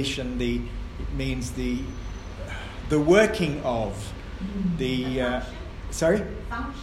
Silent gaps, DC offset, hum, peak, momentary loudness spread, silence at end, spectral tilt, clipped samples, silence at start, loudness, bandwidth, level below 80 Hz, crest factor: none; under 0.1%; none; -4 dBFS; 16 LU; 0 s; -5.5 dB/octave; under 0.1%; 0 s; -26 LUFS; 15.5 kHz; -36 dBFS; 22 dB